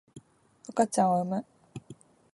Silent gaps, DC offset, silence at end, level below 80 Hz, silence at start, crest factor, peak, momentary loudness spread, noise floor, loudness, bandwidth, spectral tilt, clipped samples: none; under 0.1%; 0.4 s; -70 dBFS; 0.15 s; 20 dB; -10 dBFS; 23 LU; -56 dBFS; -28 LUFS; 11.5 kHz; -6 dB/octave; under 0.1%